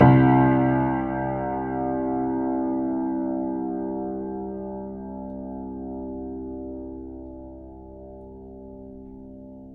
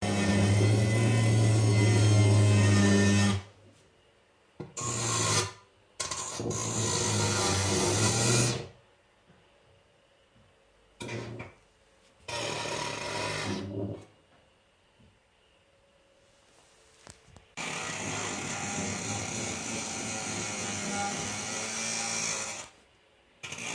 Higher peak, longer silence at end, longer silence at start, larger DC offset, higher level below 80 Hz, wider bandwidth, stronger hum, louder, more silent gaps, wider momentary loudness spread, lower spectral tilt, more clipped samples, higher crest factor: first, -4 dBFS vs -12 dBFS; about the same, 0 s vs 0 s; about the same, 0 s vs 0 s; neither; first, -46 dBFS vs -58 dBFS; second, 3.8 kHz vs 10.5 kHz; neither; first, -25 LUFS vs -28 LUFS; neither; first, 22 LU vs 16 LU; first, -12 dB/octave vs -4 dB/octave; neither; about the same, 22 dB vs 18 dB